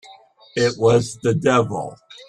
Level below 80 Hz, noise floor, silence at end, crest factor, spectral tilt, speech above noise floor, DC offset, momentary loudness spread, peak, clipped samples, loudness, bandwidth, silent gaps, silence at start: -54 dBFS; -47 dBFS; 0.05 s; 16 dB; -5.5 dB/octave; 29 dB; under 0.1%; 13 LU; -4 dBFS; under 0.1%; -19 LUFS; 11 kHz; none; 0.1 s